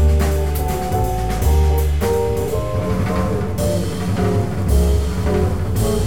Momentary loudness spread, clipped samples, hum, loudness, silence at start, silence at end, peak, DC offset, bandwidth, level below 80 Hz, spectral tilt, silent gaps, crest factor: 4 LU; under 0.1%; none; -19 LUFS; 0 s; 0 s; -6 dBFS; 3%; 17 kHz; -20 dBFS; -6.5 dB/octave; none; 12 dB